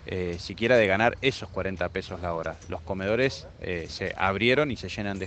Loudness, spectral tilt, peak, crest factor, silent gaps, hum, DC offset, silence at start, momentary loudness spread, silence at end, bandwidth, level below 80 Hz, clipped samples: -27 LUFS; -5.5 dB/octave; -6 dBFS; 22 dB; none; none; under 0.1%; 0 s; 12 LU; 0 s; 8.8 kHz; -48 dBFS; under 0.1%